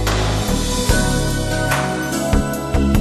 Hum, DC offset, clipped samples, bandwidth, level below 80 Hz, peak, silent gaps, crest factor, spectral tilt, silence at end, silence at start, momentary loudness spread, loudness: none; under 0.1%; under 0.1%; 13 kHz; -22 dBFS; -2 dBFS; none; 16 dB; -4.5 dB/octave; 0 s; 0 s; 3 LU; -19 LUFS